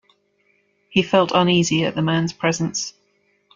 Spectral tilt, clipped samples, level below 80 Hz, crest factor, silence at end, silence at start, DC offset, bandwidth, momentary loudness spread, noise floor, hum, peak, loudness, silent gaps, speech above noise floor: -4.5 dB/octave; under 0.1%; -58 dBFS; 20 dB; 0.65 s; 0.9 s; under 0.1%; 7.6 kHz; 8 LU; -64 dBFS; none; -2 dBFS; -19 LUFS; none; 45 dB